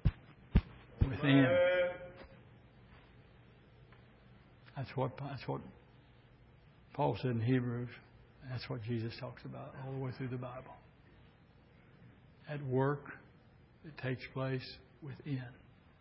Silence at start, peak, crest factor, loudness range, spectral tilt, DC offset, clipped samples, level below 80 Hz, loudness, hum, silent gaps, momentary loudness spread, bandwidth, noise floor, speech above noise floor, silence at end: 0.05 s; -14 dBFS; 24 dB; 12 LU; -6 dB/octave; under 0.1%; under 0.1%; -48 dBFS; -37 LUFS; none; none; 24 LU; 5.6 kHz; -63 dBFS; 24 dB; 0.45 s